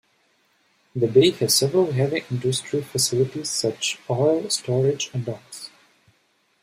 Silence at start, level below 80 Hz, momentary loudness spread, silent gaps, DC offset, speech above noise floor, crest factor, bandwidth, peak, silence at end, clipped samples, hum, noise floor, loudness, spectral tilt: 0.95 s; -64 dBFS; 15 LU; none; under 0.1%; 44 dB; 20 dB; 16 kHz; -4 dBFS; 0.95 s; under 0.1%; none; -65 dBFS; -22 LUFS; -4.5 dB/octave